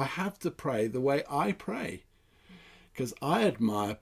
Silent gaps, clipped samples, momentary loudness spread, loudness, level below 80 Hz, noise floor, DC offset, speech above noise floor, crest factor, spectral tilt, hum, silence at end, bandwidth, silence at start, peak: none; under 0.1%; 10 LU; -31 LUFS; -62 dBFS; -57 dBFS; under 0.1%; 27 dB; 18 dB; -6 dB/octave; none; 0.05 s; 16 kHz; 0 s; -14 dBFS